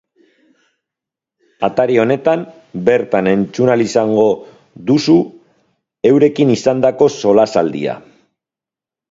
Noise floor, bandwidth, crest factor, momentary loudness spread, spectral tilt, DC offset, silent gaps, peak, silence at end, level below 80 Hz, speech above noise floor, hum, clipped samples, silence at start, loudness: -88 dBFS; 7.8 kHz; 16 dB; 10 LU; -6.5 dB/octave; under 0.1%; none; 0 dBFS; 1.1 s; -56 dBFS; 75 dB; none; under 0.1%; 1.6 s; -14 LUFS